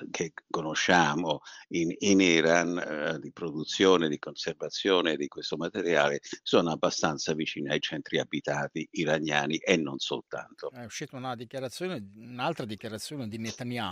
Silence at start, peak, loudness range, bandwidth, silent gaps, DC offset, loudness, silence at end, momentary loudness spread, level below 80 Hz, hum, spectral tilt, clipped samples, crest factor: 0 s; -6 dBFS; 9 LU; 15 kHz; none; under 0.1%; -29 LUFS; 0 s; 14 LU; -68 dBFS; none; -4 dB/octave; under 0.1%; 22 dB